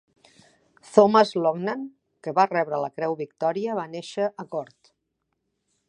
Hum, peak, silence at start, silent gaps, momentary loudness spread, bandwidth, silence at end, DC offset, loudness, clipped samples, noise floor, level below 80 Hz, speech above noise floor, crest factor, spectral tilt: none; -2 dBFS; 0.9 s; none; 16 LU; 10.5 kHz; 1.25 s; under 0.1%; -24 LUFS; under 0.1%; -78 dBFS; -76 dBFS; 55 dB; 24 dB; -6 dB/octave